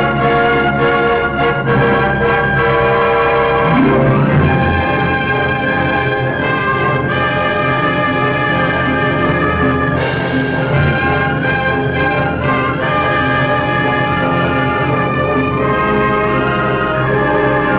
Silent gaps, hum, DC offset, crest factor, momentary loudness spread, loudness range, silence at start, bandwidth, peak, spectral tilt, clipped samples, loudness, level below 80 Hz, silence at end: none; none; 0.3%; 8 dB; 3 LU; 2 LU; 0 s; 4 kHz; -6 dBFS; -10.5 dB/octave; under 0.1%; -13 LUFS; -30 dBFS; 0 s